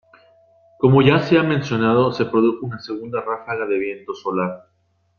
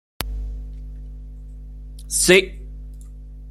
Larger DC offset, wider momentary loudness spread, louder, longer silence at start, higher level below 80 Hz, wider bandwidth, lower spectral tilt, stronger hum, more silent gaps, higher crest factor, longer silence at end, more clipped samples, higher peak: neither; second, 14 LU vs 26 LU; about the same, -19 LUFS vs -18 LUFS; first, 0.8 s vs 0.2 s; second, -58 dBFS vs -34 dBFS; second, 6.8 kHz vs 16.5 kHz; first, -8 dB/octave vs -3 dB/octave; second, none vs 50 Hz at -35 dBFS; neither; second, 18 dB vs 24 dB; first, 0.6 s vs 0 s; neither; about the same, -2 dBFS vs 0 dBFS